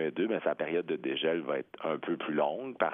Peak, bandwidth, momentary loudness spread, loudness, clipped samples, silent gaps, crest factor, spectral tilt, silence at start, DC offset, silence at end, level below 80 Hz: -12 dBFS; 3.8 kHz; 4 LU; -33 LUFS; under 0.1%; none; 20 dB; -8.5 dB/octave; 0 s; under 0.1%; 0 s; -82 dBFS